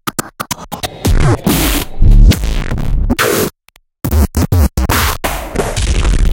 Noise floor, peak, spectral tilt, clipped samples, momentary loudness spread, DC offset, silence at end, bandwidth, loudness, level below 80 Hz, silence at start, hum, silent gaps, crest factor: -50 dBFS; 0 dBFS; -5 dB/octave; under 0.1%; 10 LU; under 0.1%; 0 s; 17.5 kHz; -14 LUFS; -14 dBFS; 0.05 s; none; none; 12 dB